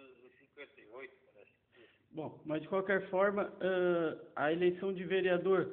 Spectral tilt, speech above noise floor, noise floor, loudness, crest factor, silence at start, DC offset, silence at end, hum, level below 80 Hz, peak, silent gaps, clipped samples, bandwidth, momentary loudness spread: -4.5 dB/octave; 32 dB; -65 dBFS; -34 LUFS; 18 dB; 0 s; under 0.1%; 0 s; none; -76 dBFS; -18 dBFS; none; under 0.1%; 4.1 kHz; 21 LU